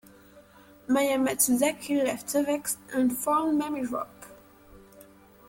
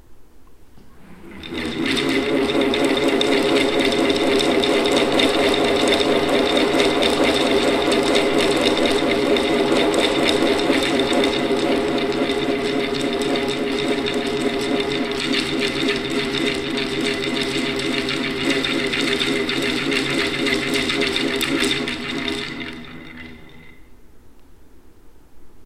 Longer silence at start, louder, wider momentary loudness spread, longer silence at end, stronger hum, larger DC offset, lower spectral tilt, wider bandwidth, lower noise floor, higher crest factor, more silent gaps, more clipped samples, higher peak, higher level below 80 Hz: first, 0.35 s vs 0.1 s; second, -26 LUFS vs -19 LUFS; first, 9 LU vs 5 LU; first, 0.45 s vs 0 s; neither; neither; about the same, -3 dB/octave vs -3.5 dB/octave; about the same, 17 kHz vs 15.5 kHz; first, -54 dBFS vs -42 dBFS; about the same, 18 dB vs 18 dB; neither; neither; second, -10 dBFS vs -2 dBFS; second, -64 dBFS vs -46 dBFS